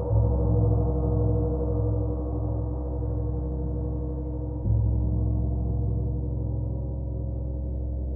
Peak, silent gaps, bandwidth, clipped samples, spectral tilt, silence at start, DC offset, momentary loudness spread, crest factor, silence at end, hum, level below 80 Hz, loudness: -12 dBFS; none; 1.5 kHz; under 0.1%; -16 dB/octave; 0 s; under 0.1%; 8 LU; 14 dB; 0 s; none; -30 dBFS; -28 LUFS